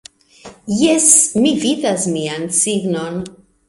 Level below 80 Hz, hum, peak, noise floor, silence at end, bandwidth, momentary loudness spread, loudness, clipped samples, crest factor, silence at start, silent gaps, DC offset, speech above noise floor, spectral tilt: -54 dBFS; none; 0 dBFS; -41 dBFS; 0.4 s; 16 kHz; 17 LU; -14 LUFS; under 0.1%; 16 dB; 0.45 s; none; under 0.1%; 25 dB; -3 dB/octave